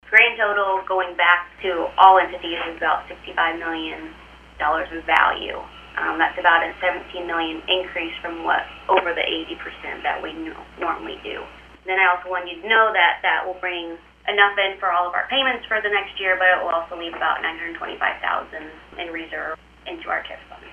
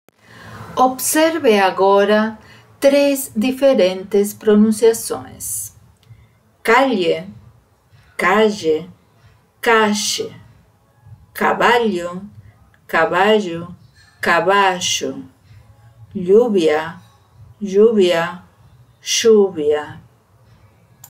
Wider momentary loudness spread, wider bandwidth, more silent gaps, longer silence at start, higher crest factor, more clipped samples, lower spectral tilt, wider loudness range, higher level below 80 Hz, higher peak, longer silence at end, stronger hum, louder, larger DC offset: about the same, 15 LU vs 17 LU; second, 10 kHz vs 16 kHz; neither; second, 0.05 s vs 0.4 s; first, 22 dB vs 16 dB; neither; about the same, -4 dB/octave vs -3.5 dB/octave; about the same, 6 LU vs 4 LU; about the same, -52 dBFS vs -56 dBFS; about the same, 0 dBFS vs -2 dBFS; second, 0 s vs 1.1 s; first, 60 Hz at -50 dBFS vs none; second, -20 LUFS vs -16 LUFS; neither